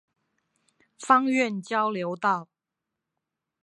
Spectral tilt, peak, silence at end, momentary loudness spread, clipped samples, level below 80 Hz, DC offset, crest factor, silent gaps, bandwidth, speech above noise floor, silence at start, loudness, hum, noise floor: -5 dB/octave; -6 dBFS; 1.2 s; 8 LU; under 0.1%; -84 dBFS; under 0.1%; 22 dB; none; 11 kHz; 61 dB; 1 s; -25 LUFS; none; -86 dBFS